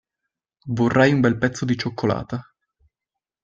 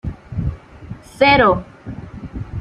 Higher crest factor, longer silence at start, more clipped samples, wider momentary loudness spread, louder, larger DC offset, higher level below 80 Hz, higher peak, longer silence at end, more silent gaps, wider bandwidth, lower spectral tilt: about the same, 20 dB vs 18 dB; first, 0.65 s vs 0.05 s; neither; second, 16 LU vs 24 LU; second, -21 LUFS vs -16 LUFS; neither; second, -52 dBFS vs -34 dBFS; about the same, -2 dBFS vs -2 dBFS; first, 1 s vs 0 s; neither; second, 7.8 kHz vs 12 kHz; about the same, -6.5 dB/octave vs -6.5 dB/octave